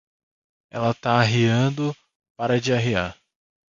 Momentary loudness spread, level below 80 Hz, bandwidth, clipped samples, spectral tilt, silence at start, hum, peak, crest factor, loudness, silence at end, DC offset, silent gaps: 12 LU; -52 dBFS; 7.6 kHz; under 0.1%; -6 dB/octave; 0.75 s; none; -4 dBFS; 20 dB; -22 LUFS; 0.55 s; under 0.1%; 2.15-2.20 s, 2.30-2.35 s